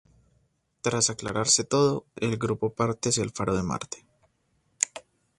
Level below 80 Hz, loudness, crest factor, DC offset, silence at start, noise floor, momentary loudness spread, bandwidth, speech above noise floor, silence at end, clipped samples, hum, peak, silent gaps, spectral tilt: -54 dBFS; -26 LUFS; 26 dB; under 0.1%; 0.85 s; -71 dBFS; 10 LU; 11.5 kHz; 44 dB; 0.4 s; under 0.1%; none; -2 dBFS; none; -3.5 dB/octave